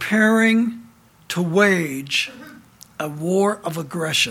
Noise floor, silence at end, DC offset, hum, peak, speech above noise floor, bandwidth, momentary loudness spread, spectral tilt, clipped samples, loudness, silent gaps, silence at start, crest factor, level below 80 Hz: -48 dBFS; 0 s; under 0.1%; none; -2 dBFS; 29 dB; 16 kHz; 14 LU; -4.5 dB/octave; under 0.1%; -20 LUFS; none; 0 s; 18 dB; -62 dBFS